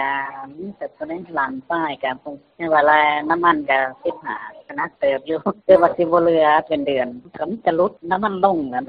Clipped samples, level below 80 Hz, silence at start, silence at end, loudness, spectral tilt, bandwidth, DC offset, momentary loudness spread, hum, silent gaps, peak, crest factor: under 0.1%; -58 dBFS; 0 s; 0.05 s; -19 LUFS; -3 dB/octave; 5 kHz; under 0.1%; 16 LU; none; none; 0 dBFS; 20 dB